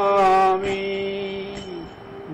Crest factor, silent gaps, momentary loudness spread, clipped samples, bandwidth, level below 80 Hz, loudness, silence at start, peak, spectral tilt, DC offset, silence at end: 12 dB; none; 20 LU; under 0.1%; 10.5 kHz; -50 dBFS; -21 LUFS; 0 s; -8 dBFS; -5.5 dB/octave; under 0.1%; 0 s